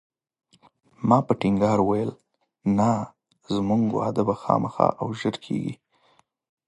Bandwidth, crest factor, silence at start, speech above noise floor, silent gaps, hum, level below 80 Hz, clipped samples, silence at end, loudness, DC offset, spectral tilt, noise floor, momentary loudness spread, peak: 11 kHz; 22 dB; 1 s; 41 dB; none; none; -56 dBFS; under 0.1%; 0.95 s; -24 LUFS; under 0.1%; -7.5 dB/octave; -63 dBFS; 9 LU; -2 dBFS